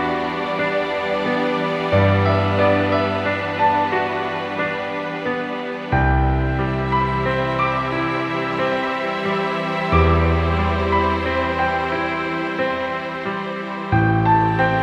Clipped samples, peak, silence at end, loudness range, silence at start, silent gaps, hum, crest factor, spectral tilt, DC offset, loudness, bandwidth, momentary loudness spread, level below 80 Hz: under 0.1%; -4 dBFS; 0 s; 3 LU; 0 s; none; none; 16 dB; -7.5 dB/octave; under 0.1%; -20 LUFS; 8.4 kHz; 7 LU; -32 dBFS